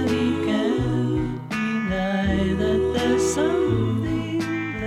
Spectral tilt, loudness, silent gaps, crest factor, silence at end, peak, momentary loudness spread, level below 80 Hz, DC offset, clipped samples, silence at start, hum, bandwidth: -6 dB/octave; -23 LUFS; none; 12 dB; 0 s; -10 dBFS; 5 LU; -38 dBFS; under 0.1%; under 0.1%; 0 s; none; 15 kHz